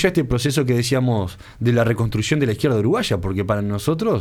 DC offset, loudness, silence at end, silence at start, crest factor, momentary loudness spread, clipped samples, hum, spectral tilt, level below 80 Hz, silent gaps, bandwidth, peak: under 0.1%; -20 LUFS; 0 s; 0 s; 16 dB; 4 LU; under 0.1%; none; -6 dB/octave; -40 dBFS; none; 16 kHz; -2 dBFS